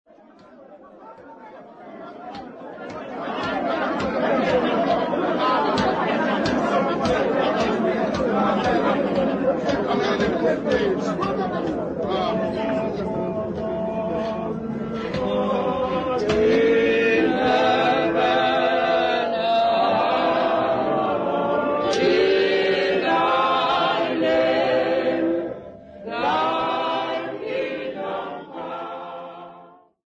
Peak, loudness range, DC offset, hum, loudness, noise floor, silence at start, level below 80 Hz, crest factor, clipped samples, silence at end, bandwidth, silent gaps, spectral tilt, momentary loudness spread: -8 dBFS; 6 LU; under 0.1%; none; -21 LUFS; -49 dBFS; 0.5 s; -50 dBFS; 14 dB; under 0.1%; 0.4 s; 9 kHz; none; -6 dB/octave; 14 LU